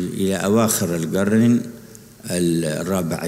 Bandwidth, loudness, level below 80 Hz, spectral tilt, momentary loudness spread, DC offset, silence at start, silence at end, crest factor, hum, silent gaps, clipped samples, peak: 16 kHz; -19 LUFS; -54 dBFS; -5.5 dB/octave; 12 LU; under 0.1%; 0 s; 0 s; 16 dB; none; none; under 0.1%; -4 dBFS